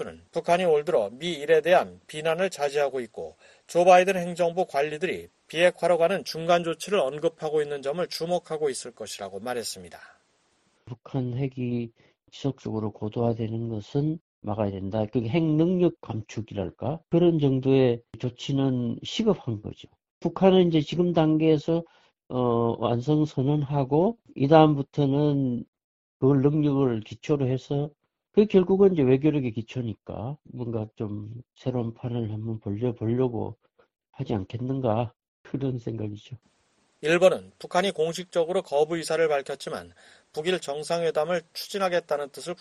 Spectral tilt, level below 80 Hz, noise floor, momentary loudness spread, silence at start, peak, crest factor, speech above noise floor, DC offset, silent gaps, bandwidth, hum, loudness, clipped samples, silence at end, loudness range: -6.5 dB/octave; -58 dBFS; -68 dBFS; 14 LU; 0 s; -2 dBFS; 24 dB; 43 dB; under 0.1%; 14.21-14.42 s, 20.11-20.21 s, 25.68-25.73 s, 25.84-26.20 s, 35.28-35.44 s; 12.5 kHz; none; -26 LUFS; under 0.1%; 0.05 s; 9 LU